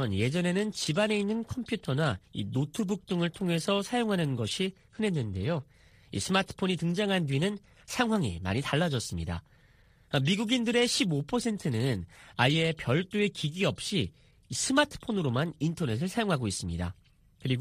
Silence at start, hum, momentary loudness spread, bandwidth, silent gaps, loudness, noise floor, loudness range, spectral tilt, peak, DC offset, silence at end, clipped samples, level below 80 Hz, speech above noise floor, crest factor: 0 s; none; 9 LU; 15.5 kHz; none; -30 LUFS; -61 dBFS; 3 LU; -5 dB/octave; -10 dBFS; under 0.1%; 0 s; under 0.1%; -56 dBFS; 31 dB; 20 dB